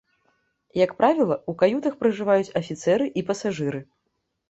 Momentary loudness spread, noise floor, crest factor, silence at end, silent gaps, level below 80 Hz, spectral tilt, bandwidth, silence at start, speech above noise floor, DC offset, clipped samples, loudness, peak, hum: 9 LU; -76 dBFS; 18 dB; 0.65 s; none; -64 dBFS; -6 dB/octave; 8.2 kHz; 0.75 s; 54 dB; under 0.1%; under 0.1%; -23 LUFS; -6 dBFS; none